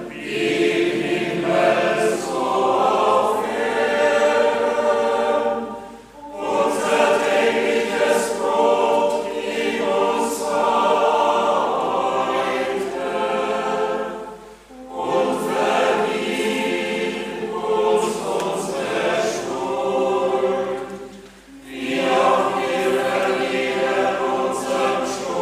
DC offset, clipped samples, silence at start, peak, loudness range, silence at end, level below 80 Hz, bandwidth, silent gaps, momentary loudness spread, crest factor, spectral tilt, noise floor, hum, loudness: under 0.1%; under 0.1%; 0 s; -2 dBFS; 4 LU; 0 s; -56 dBFS; 15.5 kHz; none; 8 LU; 18 dB; -4 dB/octave; -42 dBFS; none; -20 LUFS